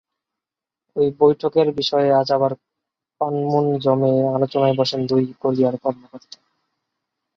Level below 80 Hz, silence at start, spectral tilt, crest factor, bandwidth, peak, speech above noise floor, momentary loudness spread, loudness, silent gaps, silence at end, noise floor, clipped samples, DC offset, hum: -62 dBFS; 0.95 s; -7.5 dB/octave; 18 dB; 7.2 kHz; -2 dBFS; 69 dB; 9 LU; -19 LUFS; none; 1.2 s; -88 dBFS; under 0.1%; under 0.1%; none